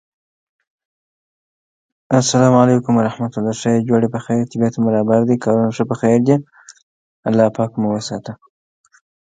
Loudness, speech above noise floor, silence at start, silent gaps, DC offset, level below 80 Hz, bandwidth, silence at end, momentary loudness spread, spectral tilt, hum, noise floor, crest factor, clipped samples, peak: -16 LUFS; over 75 dB; 2.1 s; 6.82-7.23 s; under 0.1%; -58 dBFS; 9.4 kHz; 1 s; 8 LU; -6.5 dB/octave; none; under -90 dBFS; 18 dB; under 0.1%; 0 dBFS